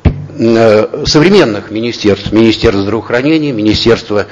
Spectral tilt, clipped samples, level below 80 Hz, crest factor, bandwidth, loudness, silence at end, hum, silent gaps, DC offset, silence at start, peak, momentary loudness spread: -6 dB/octave; 1%; -28 dBFS; 10 dB; 7.8 kHz; -10 LUFS; 0 s; none; none; under 0.1%; 0.05 s; 0 dBFS; 7 LU